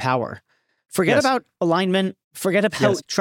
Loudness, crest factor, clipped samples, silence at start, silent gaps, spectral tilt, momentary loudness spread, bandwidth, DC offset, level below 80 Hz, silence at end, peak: -21 LUFS; 16 dB; under 0.1%; 0 s; 2.24-2.31 s; -5 dB/octave; 10 LU; 17 kHz; under 0.1%; -64 dBFS; 0 s; -4 dBFS